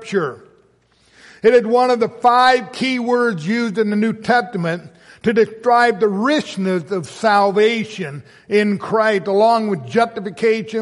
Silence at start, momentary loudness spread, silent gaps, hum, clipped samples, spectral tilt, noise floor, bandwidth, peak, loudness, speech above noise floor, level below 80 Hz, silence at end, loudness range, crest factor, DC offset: 0 s; 9 LU; none; none; under 0.1%; -5.5 dB/octave; -56 dBFS; 11.5 kHz; -2 dBFS; -17 LUFS; 40 dB; -62 dBFS; 0 s; 2 LU; 14 dB; under 0.1%